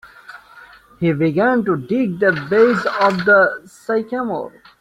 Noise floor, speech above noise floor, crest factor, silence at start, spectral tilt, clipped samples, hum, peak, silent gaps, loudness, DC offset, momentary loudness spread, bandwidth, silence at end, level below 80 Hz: -44 dBFS; 27 dB; 16 dB; 0.05 s; -7 dB/octave; under 0.1%; none; -2 dBFS; none; -17 LUFS; under 0.1%; 10 LU; 13 kHz; 0.3 s; -58 dBFS